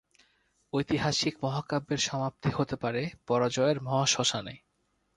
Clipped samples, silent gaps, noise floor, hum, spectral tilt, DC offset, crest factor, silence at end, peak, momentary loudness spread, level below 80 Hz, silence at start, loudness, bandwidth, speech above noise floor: under 0.1%; none; -75 dBFS; none; -4 dB/octave; under 0.1%; 20 dB; 0.6 s; -10 dBFS; 8 LU; -60 dBFS; 0.75 s; -29 LUFS; 11.5 kHz; 46 dB